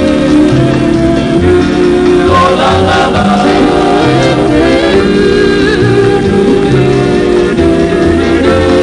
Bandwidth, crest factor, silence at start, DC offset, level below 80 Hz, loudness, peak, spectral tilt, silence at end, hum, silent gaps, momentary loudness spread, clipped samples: 10.5 kHz; 8 dB; 0 s; under 0.1%; -26 dBFS; -8 LUFS; 0 dBFS; -6.5 dB/octave; 0 s; none; none; 2 LU; 0.6%